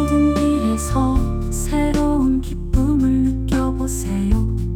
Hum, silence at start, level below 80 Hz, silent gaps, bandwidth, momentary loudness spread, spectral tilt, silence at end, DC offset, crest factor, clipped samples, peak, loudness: none; 0 s; -24 dBFS; none; 18 kHz; 6 LU; -6.5 dB/octave; 0 s; under 0.1%; 12 dB; under 0.1%; -6 dBFS; -19 LUFS